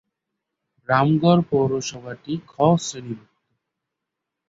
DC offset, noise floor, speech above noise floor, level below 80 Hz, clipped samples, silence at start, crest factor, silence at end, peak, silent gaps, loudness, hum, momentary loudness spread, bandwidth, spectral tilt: under 0.1%; -83 dBFS; 62 dB; -60 dBFS; under 0.1%; 0.9 s; 20 dB; 1.3 s; -4 dBFS; none; -21 LUFS; none; 18 LU; 7.8 kHz; -6 dB/octave